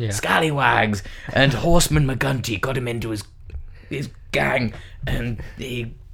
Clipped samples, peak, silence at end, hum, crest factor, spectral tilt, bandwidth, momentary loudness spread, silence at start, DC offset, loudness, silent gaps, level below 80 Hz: under 0.1%; 0 dBFS; 0 s; none; 22 dB; -4.5 dB/octave; 17 kHz; 14 LU; 0 s; under 0.1%; -21 LUFS; none; -32 dBFS